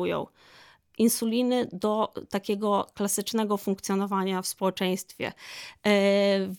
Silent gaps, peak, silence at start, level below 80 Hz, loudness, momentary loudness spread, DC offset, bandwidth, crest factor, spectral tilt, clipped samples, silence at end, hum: none; -10 dBFS; 0 s; -70 dBFS; -27 LUFS; 12 LU; under 0.1%; 19.5 kHz; 16 dB; -4.5 dB/octave; under 0.1%; 0 s; none